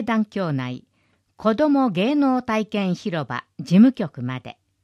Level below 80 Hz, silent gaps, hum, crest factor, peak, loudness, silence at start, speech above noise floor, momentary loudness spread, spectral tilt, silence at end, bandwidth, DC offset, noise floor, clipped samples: -62 dBFS; none; none; 16 dB; -4 dBFS; -21 LUFS; 0 s; 45 dB; 15 LU; -7.5 dB/octave; 0.3 s; 11 kHz; under 0.1%; -66 dBFS; under 0.1%